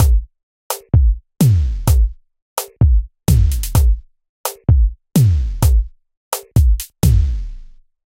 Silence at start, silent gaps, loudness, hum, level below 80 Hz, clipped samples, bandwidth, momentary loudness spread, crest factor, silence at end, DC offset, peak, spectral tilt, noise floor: 0 s; 0.43-0.70 s, 2.42-2.56 s, 4.29-4.44 s, 6.17-6.31 s; -17 LUFS; none; -18 dBFS; under 0.1%; 16.5 kHz; 12 LU; 14 dB; 0.55 s; 0.1%; -2 dBFS; -6.5 dB/octave; -37 dBFS